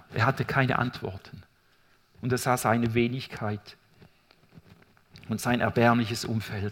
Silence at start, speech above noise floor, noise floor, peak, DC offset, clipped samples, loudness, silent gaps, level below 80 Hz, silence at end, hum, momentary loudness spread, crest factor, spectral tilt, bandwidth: 0.1 s; 36 dB; -63 dBFS; -6 dBFS; under 0.1%; under 0.1%; -27 LUFS; none; -58 dBFS; 0 s; none; 15 LU; 22 dB; -5.5 dB/octave; 17 kHz